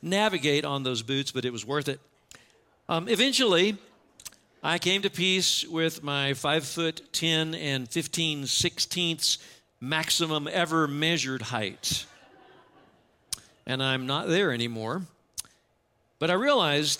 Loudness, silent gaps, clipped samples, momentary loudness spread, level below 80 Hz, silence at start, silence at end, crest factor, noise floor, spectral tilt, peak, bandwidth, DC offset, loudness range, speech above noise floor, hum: -26 LUFS; none; under 0.1%; 14 LU; -66 dBFS; 0 s; 0 s; 20 dB; -70 dBFS; -3 dB/octave; -10 dBFS; 16.5 kHz; under 0.1%; 5 LU; 43 dB; none